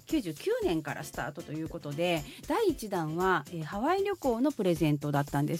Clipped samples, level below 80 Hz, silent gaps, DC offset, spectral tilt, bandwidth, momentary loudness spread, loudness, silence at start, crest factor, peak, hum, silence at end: under 0.1%; -54 dBFS; none; under 0.1%; -6 dB/octave; 16.5 kHz; 9 LU; -31 LUFS; 0.1 s; 16 dB; -14 dBFS; none; 0 s